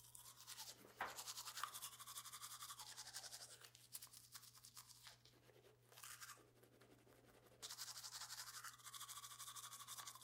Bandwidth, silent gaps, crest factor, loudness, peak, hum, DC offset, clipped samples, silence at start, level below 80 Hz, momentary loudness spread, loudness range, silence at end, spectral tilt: 16 kHz; none; 28 dB; -54 LUFS; -30 dBFS; none; under 0.1%; under 0.1%; 0 s; -88 dBFS; 14 LU; 8 LU; 0 s; 0 dB/octave